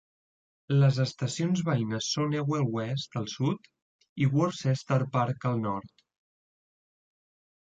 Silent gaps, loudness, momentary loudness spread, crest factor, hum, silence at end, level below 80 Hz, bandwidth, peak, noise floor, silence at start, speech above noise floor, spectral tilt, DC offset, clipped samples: 3.82-3.99 s, 4.09-4.16 s; -29 LUFS; 8 LU; 16 dB; none; 1.8 s; -66 dBFS; 7.8 kHz; -14 dBFS; under -90 dBFS; 0.7 s; over 62 dB; -6 dB/octave; under 0.1%; under 0.1%